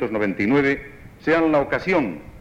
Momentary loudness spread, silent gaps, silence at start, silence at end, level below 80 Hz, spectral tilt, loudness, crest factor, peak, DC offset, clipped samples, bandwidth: 10 LU; none; 0 s; 0 s; -48 dBFS; -7.5 dB/octave; -21 LUFS; 14 dB; -8 dBFS; under 0.1%; under 0.1%; 8.8 kHz